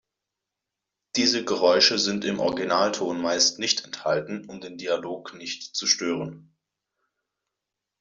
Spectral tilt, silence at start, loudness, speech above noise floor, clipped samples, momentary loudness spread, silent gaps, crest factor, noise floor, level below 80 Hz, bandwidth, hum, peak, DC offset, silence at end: -2 dB/octave; 1.15 s; -23 LUFS; 61 dB; under 0.1%; 16 LU; none; 22 dB; -86 dBFS; -68 dBFS; 7.8 kHz; none; -4 dBFS; under 0.1%; 1.6 s